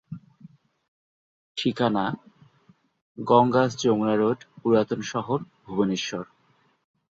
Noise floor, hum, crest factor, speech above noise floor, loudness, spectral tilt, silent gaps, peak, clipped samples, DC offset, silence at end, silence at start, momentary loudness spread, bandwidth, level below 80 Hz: -65 dBFS; none; 22 dB; 41 dB; -24 LUFS; -6 dB/octave; 0.88-1.55 s, 3.01-3.15 s; -4 dBFS; under 0.1%; under 0.1%; 0.85 s; 0.1 s; 16 LU; 7.8 kHz; -64 dBFS